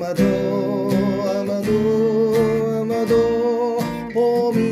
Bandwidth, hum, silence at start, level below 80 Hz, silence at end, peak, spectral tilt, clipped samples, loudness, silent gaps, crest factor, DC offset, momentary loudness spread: 16 kHz; none; 0 s; -48 dBFS; 0 s; -6 dBFS; -7 dB/octave; under 0.1%; -19 LUFS; none; 12 dB; under 0.1%; 4 LU